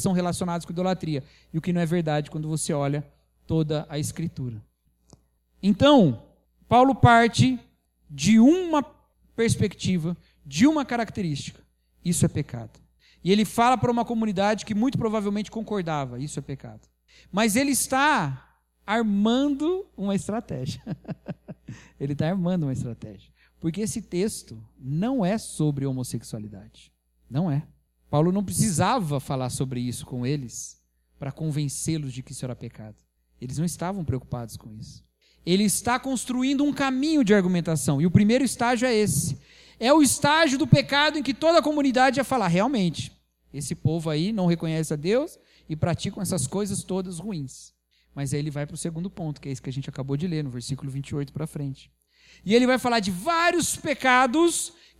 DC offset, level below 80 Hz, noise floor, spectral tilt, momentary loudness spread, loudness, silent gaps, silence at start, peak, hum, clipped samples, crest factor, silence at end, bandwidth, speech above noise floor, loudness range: under 0.1%; -52 dBFS; -58 dBFS; -5 dB/octave; 17 LU; -24 LUFS; none; 0 s; -2 dBFS; none; under 0.1%; 22 dB; 0.3 s; 15.5 kHz; 34 dB; 10 LU